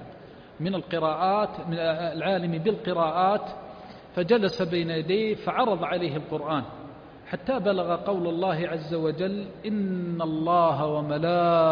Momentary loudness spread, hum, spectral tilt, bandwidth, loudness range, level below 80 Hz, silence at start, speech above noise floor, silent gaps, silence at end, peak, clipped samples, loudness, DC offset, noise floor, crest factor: 12 LU; none; -8 dB/octave; 5.2 kHz; 2 LU; -60 dBFS; 0 s; 21 dB; none; 0 s; -8 dBFS; under 0.1%; -26 LUFS; under 0.1%; -46 dBFS; 18 dB